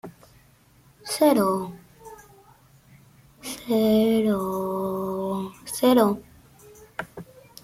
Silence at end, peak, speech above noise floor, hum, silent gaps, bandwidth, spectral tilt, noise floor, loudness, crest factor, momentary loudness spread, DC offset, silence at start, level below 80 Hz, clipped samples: 0.4 s; -8 dBFS; 35 dB; none; none; 16 kHz; -5.5 dB/octave; -57 dBFS; -23 LUFS; 18 dB; 25 LU; under 0.1%; 0.05 s; -60 dBFS; under 0.1%